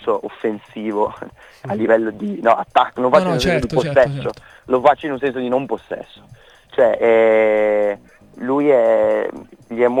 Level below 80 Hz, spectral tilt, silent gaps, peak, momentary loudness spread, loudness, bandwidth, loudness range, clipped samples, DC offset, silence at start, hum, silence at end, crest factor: -46 dBFS; -6.5 dB/octave; none; 0 dBFS; 14 LU; -17 LUFS; 12.5 kHz; 3 LU; under 0.1%; under 0.1%; 0 s; none; 0 s; 18 dB